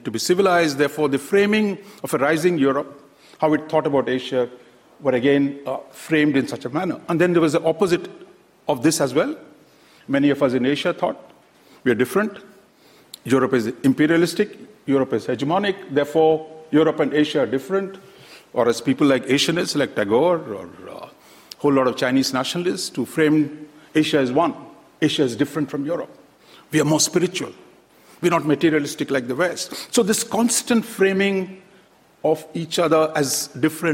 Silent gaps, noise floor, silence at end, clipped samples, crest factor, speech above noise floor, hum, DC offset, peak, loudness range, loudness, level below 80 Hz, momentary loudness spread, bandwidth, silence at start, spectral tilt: none; -53 dBFS; 0 s; under 0.1%; 16 dB; 33 dB; none; under 0.1%; -6 dBFS; 2 LU; -20 LUFS; -62 dBFS; 9 LU; 16.5 kHz; 0.05 s; -4.5 dB/octave